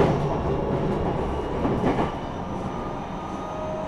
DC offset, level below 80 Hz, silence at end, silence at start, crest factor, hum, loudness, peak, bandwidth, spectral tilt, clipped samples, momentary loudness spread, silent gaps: under 0.1%; -36 dBFS; 0 s; 0 s; 18 dB; none; -27 LUFS; -6 dBFS; 11 kHz; -8 dB/octave; under 0.1%; 8 LU; none